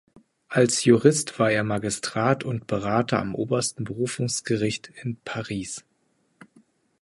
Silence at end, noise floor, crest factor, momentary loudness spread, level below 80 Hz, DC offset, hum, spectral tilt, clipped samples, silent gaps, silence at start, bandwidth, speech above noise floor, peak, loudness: 1.2 s; -69 dBFS; 22 dB; 13 LU; -58 dBFS; under 0.1%; none; -4.5 dB/octave; under 0.1%; none; 0.5 s; 11.5 kHz; 45 dB; -4 dBFS; -24 LUFS